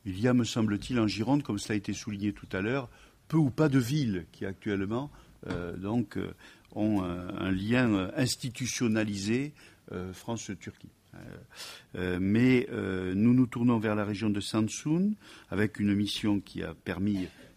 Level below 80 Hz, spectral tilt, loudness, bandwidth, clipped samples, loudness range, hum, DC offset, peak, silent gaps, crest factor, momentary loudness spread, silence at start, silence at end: -58 dBFS; -6 dB/octave; -30 LUFS; 15.5 kHz; under 0.1%; 6 LU; none; under 0.1%; -12 dBFS; none; 18 dB; 15 LU; 0.05 s; 0.1 s